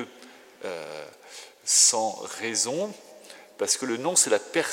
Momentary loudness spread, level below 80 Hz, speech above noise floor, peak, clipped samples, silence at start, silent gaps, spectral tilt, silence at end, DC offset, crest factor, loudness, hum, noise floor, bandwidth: 23 LU; -88 dBFS; 25 dB; -6 dBFS; under 0.1%; 0 s; none; -0.5 dB/octave; 0 s; under 0.1%; 22 dB; -23 LUFS; none; -50 dBFS; 16.5 kHz